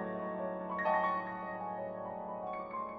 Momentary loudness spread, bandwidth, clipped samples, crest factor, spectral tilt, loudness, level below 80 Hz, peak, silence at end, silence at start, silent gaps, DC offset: 9 LU; 6.2 kHz; under 0.1%; 18 dB; -8.5 dB/octave; -37 LUFS; -70 dBFS; -20 dBFS; 0 s; 0 s; none; under 0.1%